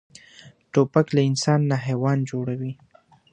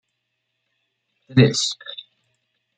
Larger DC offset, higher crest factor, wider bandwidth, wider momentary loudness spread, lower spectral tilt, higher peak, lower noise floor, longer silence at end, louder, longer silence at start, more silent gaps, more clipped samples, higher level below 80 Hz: neither; about the same, 20 dB vs 22 dB; about the same, 9.6 kHz vs 9.4 kHz; second, 10 LU vs 20 LU; first, -6.5 dB/octave vs -5 dB/octave; about the same, -4 dBFS vs -2 dBFS; second, -50 dBFS vs -76 dBFS; second, 0.6 s vs 0.85 s; second, -22 LUFS vs -19 LUFS; second, 0.45 s vs 1.3 s; neither; neither; second, -64 dBFS vs -58 dBFS